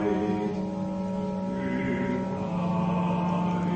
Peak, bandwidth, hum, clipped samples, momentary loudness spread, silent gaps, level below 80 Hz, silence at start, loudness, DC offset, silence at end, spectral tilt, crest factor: -16 dBFS; 8.4 kHz; none; under 0.1%; 4 LU; none; -52 dBFS; 0 s; -28 LUFS; under 0.1%; 0 s; -8.5 dB/octave; 12 dB